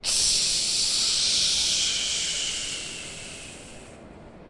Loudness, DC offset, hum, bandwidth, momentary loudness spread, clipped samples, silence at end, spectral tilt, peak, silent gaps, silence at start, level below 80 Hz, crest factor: -22 LUFS; under 0.1%; none; 11.5 kHz; 18 LU; under 0.1%; 0 s; 1 dB/octave; -12 dBFS; none; 0.05 s; -50 dBFS; 16 dB